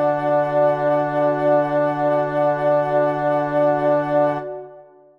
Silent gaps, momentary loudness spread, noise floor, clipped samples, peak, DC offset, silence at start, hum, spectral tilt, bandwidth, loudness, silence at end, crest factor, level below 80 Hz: none; 3 LU; -45 dBFS; under 0.1%; -8 dBFS; under 0.1%; 0 s; none; -8.5 dB/octave; 5.6 kHz; -19 LUFS; 0.35 s; 12 dB; -56 dBFS